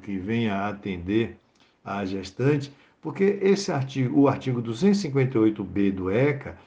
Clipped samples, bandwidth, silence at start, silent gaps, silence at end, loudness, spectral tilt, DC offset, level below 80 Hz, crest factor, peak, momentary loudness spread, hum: under 0.1%; 9.2 kHz; 0 s; none; 0.1 s; -25 LUFS; -7 dB/octave; under 0.1%; -58 dBFS; 16 dB; -8 dBFS; 11 LU; none